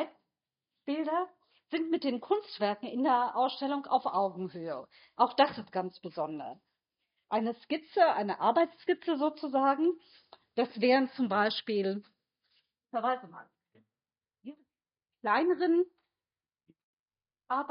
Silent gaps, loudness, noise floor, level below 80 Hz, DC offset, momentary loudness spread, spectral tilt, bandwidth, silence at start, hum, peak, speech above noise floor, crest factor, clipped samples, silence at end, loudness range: 16.84-17.06 s; -31 LUFS; under -90 dBFS; -86 dBFS; under 0.1%; 14 LU; -3 dB/octave; 5.4 kHz; 0 s; none; -12 dBFS; over 60 dB; 22 dB; under 0.1%; 0.05 s; 5 LU